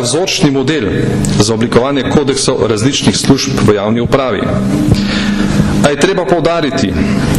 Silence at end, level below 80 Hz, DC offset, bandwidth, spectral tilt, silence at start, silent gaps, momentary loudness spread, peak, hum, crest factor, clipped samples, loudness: 0 s; -28 dBFS; 0.1%; 14 kHz; -5 dB/octave; 0 s; none; 3 LU; 0 dBFS; none; 10 dB; under 0.1%; -11 LUFS